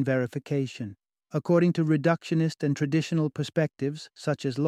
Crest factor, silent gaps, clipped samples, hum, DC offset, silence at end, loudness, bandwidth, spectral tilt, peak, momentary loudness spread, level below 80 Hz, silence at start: 18 dB; none; under 0.1%; none; under 0.1%; 0 s; -27 LUFS; 11 kHz; -7 dB/octave; -10 dBFS; 11 LU; -68 dBFS; 0 s